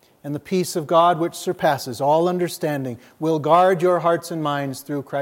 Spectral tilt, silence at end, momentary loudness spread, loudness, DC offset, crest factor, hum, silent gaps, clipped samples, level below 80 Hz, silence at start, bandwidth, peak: -5.5 dB/octave; 0 s; 11 LU; -20 LUFS; under 0.1%; 16 dB; none; none; under 0.1%; -68 dBFS; 0.25 s; 16.5 kHz; -4 dBFS